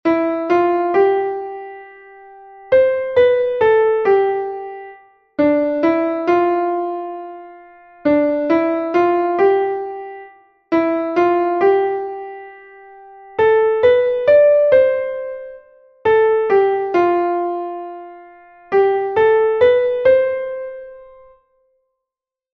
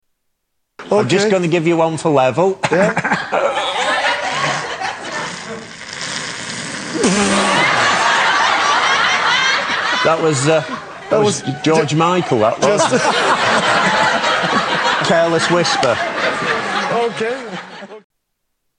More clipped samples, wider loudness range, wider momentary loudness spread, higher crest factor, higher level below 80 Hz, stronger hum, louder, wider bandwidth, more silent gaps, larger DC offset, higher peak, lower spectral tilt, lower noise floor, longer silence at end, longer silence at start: neither; about the same, 4 LU vs 6 LU; first, 17 LU vs 11 LU; about the same, 16 dB vs 14 dB; about the same, -56 dBFS vs -54 dBFS; neither; about the same, -16 LUFS vs -15 LUFS; second, 6.2 kHz vs 10.5 kHz; neither; neither; about the same, -2 dBFS vs -2 dBFS; first, -7 dB/octave vs -3.5 dB/octave; first, -87 dBFS vs -71 dBFS; first, 1.5 s vs 0.8 s; second, 0.05 s vs 0.8 s